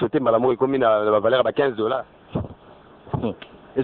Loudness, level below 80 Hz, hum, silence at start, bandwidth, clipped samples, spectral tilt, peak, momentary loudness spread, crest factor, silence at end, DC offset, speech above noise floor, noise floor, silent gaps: -21 LUFS; -50 dBFS; none; 0 s; 4.4 kHz; under 0.1%; -10 dB/octave; -6 dBFS; 13 LU; 16 dB; 0 s; under 0.1%; 28 dB; -48 dBFS; none